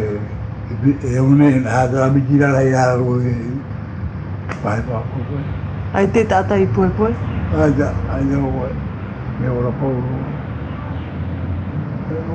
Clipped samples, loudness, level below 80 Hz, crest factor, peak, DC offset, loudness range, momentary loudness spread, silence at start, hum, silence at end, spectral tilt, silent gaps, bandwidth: under 0.1%; -18 LUFS; -34 dBFS; 16 dB; -2 dBFS; under 0.1%; 7 LU; 12 LU; 0 s; none; 0 s; -8.5 dB/octave; none; 8.8 kHz